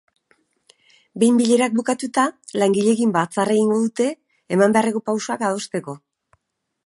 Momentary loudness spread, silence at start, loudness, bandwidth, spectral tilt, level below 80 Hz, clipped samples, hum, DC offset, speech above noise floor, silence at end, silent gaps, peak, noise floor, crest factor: 11 LU; 1.15 s; -20 LUFS; 11.5 kHz; -5 dB/octave; -70 dBFS; under 0.1%; none; under 0.1%; 51 dB; 0.9 s; none; -2 dBFS; -70 dBFS; 18 dB